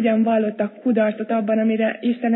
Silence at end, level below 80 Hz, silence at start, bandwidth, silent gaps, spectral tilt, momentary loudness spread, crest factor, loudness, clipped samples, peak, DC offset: 0 s; -84 dBFS; 0 s; 4.1 kHz; none; -11 dB/octave; 5 LU; 12 dB; -20 LUFS; under 0.1%; -6 dBFS; under 0.1%